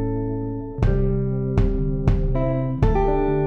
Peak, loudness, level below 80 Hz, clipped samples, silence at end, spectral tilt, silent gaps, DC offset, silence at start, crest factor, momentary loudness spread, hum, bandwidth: -6 dBFS; -23 LUFS; -24 dBFS; under 0.1%; 0 s; -10 dB/octave; none; under 0.1%; 0 s; 14 dB; 5 LU; none; 6.2 kHz